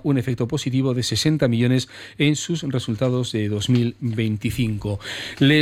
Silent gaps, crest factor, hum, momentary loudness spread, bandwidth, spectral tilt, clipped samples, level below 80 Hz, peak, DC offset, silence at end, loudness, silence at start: none; 14 dB; none; 6 LU; 16 kHz; -5.5 dB/octave; under 0.1%; -46 dBFS; -6 dBFS; under 0.1%; 0 s; -22 LUFS; 0.05 s